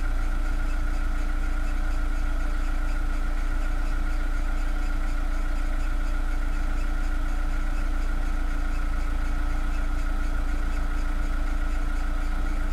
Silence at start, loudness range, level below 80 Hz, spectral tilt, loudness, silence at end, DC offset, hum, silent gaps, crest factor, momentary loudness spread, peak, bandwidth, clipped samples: 0 s; 0 LU; -24 dBFS; -6 dB/octave; -31 LUFS; 0 s; under 0.1%; none; none; 8 dB; 0 LU; -16 dBFS; 9.8 kHz; under 0.1%